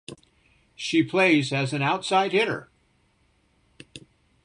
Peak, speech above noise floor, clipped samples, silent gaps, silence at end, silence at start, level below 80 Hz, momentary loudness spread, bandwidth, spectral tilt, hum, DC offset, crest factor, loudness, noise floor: -8 dBFS; 43 dB; under 0.1%; none; 0.45 s; 0.1 s; -66 dBFS; 25 LU; 11 kHz; -5 dB/octave; none; under 0.1%; 18 dB; -23 LUFS; -65 dBFS